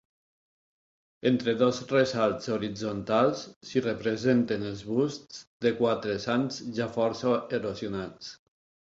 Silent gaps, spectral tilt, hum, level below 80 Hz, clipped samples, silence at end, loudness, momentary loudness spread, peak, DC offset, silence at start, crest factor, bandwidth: 3.56-3.61 s, 5.47-5.60 s; -6 dB/octave; none; -62 dBFS; under 0.1%; 0.65 s; -28 LUFS; 10 LU; -10 dBFS; under 0.1%; 1.25 s; 18 dB; 7.8 kHz